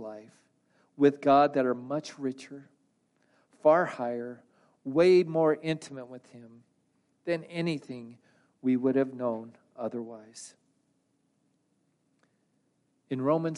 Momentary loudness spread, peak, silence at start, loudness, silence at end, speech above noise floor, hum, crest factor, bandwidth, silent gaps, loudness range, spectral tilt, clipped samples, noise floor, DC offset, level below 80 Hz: 23 LU; -10 dBFS; 0 s; -28 LUFS; 0 s; 46 dB; none; 20 dB; 11.5 kHz; none; 12 LU; -6.5 dB/octave; under 0.1%; -74 dBFS; under 0.1%; -80 dBFS